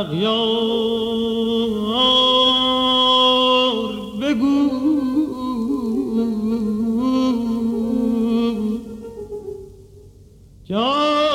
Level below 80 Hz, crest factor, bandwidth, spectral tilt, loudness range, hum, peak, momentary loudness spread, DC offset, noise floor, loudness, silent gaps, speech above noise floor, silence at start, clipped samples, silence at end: -48 dBFS; 14 dB; 14.5 kHz; -5 dB/octave; 8 LU; none; -6 dBFS; 13 LU; under 0.1%; -45 dBFS; -18 LUFS; none; 26 dB; 0 s; under 0.1%; 0 s